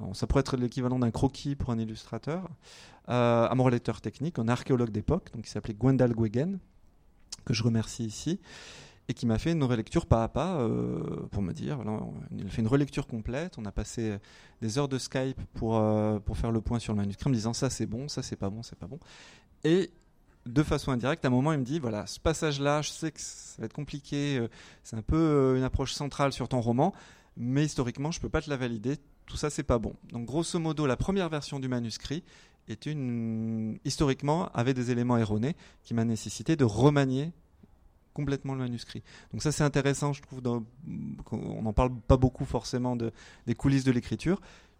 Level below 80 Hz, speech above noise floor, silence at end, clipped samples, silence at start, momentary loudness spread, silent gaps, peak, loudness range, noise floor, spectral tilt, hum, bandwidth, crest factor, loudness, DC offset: -44 dBFS; 31 dB; 0.25 s; under 0.1%; 0 s; 13 LU; none; -10 dBFS; 4 LU; -60 dBFS; -6.5 dB/octave; none; 15 kHz; 20 dB; -30 LUFS; under 0.1%